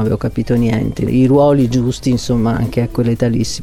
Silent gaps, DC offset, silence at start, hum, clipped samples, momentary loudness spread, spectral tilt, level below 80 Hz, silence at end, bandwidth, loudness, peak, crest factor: none; under 0.1%; 0 s; none; under 0.1%; 7 LU; -7 dB/octave; -32 dBFS; 0 s; 14.5 kHz; -15 LUFS; -2 dBFS; 12 dB